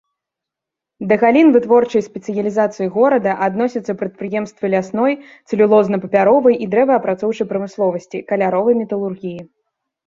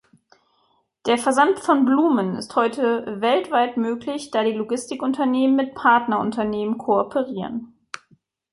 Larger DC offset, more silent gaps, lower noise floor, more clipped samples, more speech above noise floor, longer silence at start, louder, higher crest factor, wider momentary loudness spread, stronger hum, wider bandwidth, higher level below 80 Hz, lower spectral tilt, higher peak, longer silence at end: neither; neither; first, -84 dBFS vs -65 dBFS; neither; first, 69 dB vs 45 dB; about the same, 1 s vs 1.05 s; first, -16 LUFS vs -21 LUFS; about the same, 16 dB vs 18 dB; about the same, 12 LU vs 11 LU; neither; second, 7.6 kHz vs 11.5 kHz; about the same, -60 dBFS vs -64 dBFS; first, -7.5 dB/octave vs -5 dB/octave; first, 0 dBFS vs -4 dBFS; second, 0.65 s vs 0.85 s